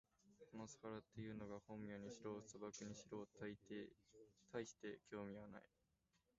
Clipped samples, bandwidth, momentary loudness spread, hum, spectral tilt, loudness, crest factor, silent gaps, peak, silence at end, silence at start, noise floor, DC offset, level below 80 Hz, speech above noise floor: under 0.1%; 7.6 kHz; 5 LU; none; -5.5 dB/octave; -55 LUFS; 20 dB; none; -36 dBFS; 0.7 s; 0.25 s; -86 dBFS; under 0.1%; -80 dBFS; 31 dB